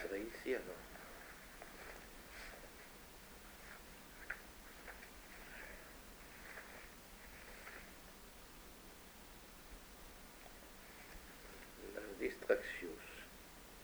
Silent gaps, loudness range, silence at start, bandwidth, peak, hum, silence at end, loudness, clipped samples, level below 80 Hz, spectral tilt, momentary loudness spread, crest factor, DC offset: none; 10 LU; 0 s; over 20 kHz; -20 dBFS; none; 0 s; -50 LUFS; under 0.1%; -64 dBFS; -3.5 dB/octave; 13 LU; 30 dB; under 0.1%